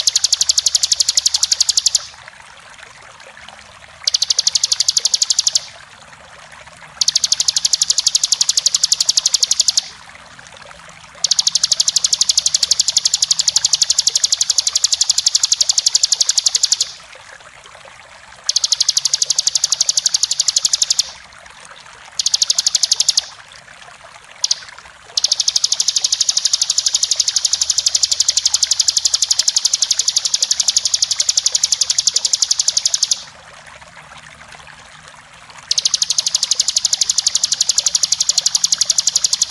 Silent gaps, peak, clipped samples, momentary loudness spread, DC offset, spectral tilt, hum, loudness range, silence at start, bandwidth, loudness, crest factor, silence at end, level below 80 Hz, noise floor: none; 0 dBFS; under 0.1%; 4 LU; under 0.1%; 3.5 dB/octave; none; 5 LU; 0 s; 16 kHz; -13 LUFS; 18 dB; 0 s; -56 dBFS; -40 dBFS